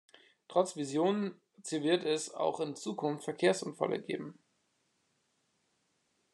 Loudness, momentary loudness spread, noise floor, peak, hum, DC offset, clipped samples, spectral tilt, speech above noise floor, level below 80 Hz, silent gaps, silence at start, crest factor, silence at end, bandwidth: -34 LUFS; 10 LU; -77 dBFS; -14 dBFS; none; under 0.1%; under 0.1%; -4.5 dB/octave; 44 dB; -88 dBFS; none; 0.5 s; 22 dB; 2 s; 12 kHz